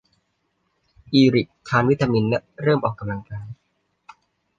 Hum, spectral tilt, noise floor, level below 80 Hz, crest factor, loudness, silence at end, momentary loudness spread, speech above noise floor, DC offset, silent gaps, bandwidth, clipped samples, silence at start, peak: none; -7.5 dB/octave; -71 dBFS; -54 dBFS; 20 dB; -21 LUFS; 1.05 s; 17 LU; 51 dB; under 0.1%; none; 7.6 kHz; under 0.1%; 1.1 s; -4 dBFS